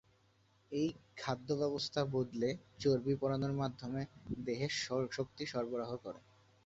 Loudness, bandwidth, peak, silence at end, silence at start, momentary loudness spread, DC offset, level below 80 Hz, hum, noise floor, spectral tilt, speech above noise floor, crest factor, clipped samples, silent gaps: -38 LUFS; 8 kHz; -20 dBFS; 0.45 s; 0.7 s; 9 LU; under 0.1%; -66 dBFS; none; -71 dBFS; -5.5 dB/octave; 34 dB; 20 dB; under 0.1%; none